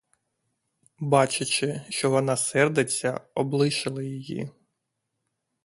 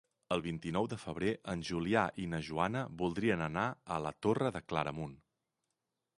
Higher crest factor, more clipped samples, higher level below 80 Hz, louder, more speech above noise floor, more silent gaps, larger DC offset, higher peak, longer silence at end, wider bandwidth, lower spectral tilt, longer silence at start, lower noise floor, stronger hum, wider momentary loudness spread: about the same, 22 dB vs 22 dB; neither; second, -68 dBFS vs -60 dBFS; first, -25 LUFS vs -36 LUFS; about the same, 55 dB vs 52 dB; neither; neither; first, -6 dBFS vs -14 dBFS; about the same, 1.15 s vs 1.05 s; about the same, 11.5 kHz vs 11.5 kHz; second, -4 dB/octave vs -6.5 dB/octave; first, 1 s vs 0.3 s; second, -80 dBFS vs -87 dBFS; neither; first, 12 LU vs 6 LU